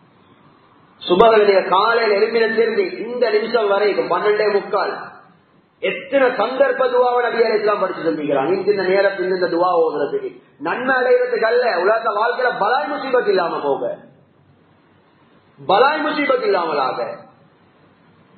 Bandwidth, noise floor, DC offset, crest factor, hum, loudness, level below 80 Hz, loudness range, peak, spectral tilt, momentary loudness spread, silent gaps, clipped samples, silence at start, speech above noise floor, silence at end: 4.6 kHz; -54 dBFS; under 0.1%; 18 dB; none; -17 LUFS; -60 dBFS; 4 LU; 0 dBFS; -8 dB/octave; 9 LU; none; under 0.1%; 1 s; 37 dB; 1.15 s